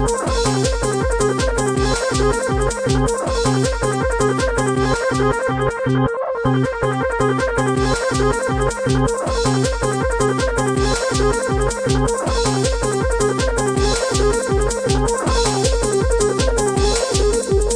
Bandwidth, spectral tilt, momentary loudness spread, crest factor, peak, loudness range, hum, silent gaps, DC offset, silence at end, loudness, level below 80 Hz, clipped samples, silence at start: 10.5 kHz; -4.5 dB/octave; 2 LU; 12 dB; -4 dBFS; 1 LU; none; none; under 0.1%; 0 s; -18 LUFS; -26 dBFS; under 0.1%; 0 s